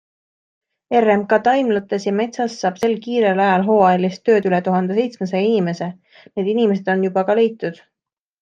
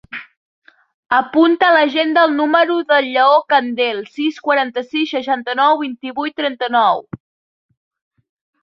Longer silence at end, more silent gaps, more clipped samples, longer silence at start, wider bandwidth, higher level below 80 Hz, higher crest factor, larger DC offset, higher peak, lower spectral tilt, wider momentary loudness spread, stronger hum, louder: second, 0.7 s vs 1.45 s; second, none vs 0.37-0.62 s, 0.94-1.03 s; neither; first, 0.9 s vs 0.1 s; first, 7.4 kHz vs 6.4 kHz; about the same, -66 dBFS vs -64 dBFS; about the same, 16 dB vs 16 dB; neither; about the same, -2 dBFS vs -2 dBFS; first, -6.5 dB/octave vs -5 dB/octave; second, 7 LU vs 11 LU; neither; second, -18 LUFS vs -15 LUFS